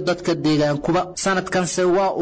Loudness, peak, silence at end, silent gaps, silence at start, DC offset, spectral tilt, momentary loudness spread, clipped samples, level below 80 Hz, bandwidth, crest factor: -20 LUFS; -10 dBFS; 0 s; none; 0 s; under 0.1%; -5 dB/octave; 3 LU; under 0.1%; -50 dBFS; 8 kHz; 8 dB